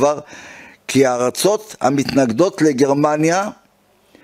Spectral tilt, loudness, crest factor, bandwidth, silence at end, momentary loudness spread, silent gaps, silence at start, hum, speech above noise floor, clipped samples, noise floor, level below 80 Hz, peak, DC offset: -5 dB/octave; -17 LUFS; 16 dB; 16 kHz; 0.7 s; 16 LU; none; 0 s; none; 40 dB; under 0.1%; -56 dBFS; -56 dBFS; 0 dBFS; under 0.1%